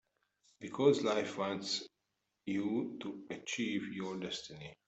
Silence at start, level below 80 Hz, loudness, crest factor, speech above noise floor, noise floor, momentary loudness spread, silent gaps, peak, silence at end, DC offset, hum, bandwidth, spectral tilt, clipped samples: 0.6 s; -76 dBFS; -37 LUFS; 22 dB; 49 dB; -85 dBFS; 16 LU; none; -16 dBFS; 0.15 s; under 0.1%; none; 8.2 kHz; -4.5 dB/octave; under 0.1%